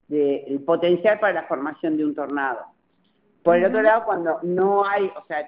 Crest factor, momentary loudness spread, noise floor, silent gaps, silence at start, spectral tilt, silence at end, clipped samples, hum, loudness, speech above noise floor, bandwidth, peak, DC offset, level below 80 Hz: 18 dB; 8 LU; -65 dBFS; none; 0.1 s; -4.5 dB/octave; 0 s; under 0.1%; none; -21 LUFS; 44 dB; 5.2 kHz; -4 dBFS; under 0.1%; -70 dBFS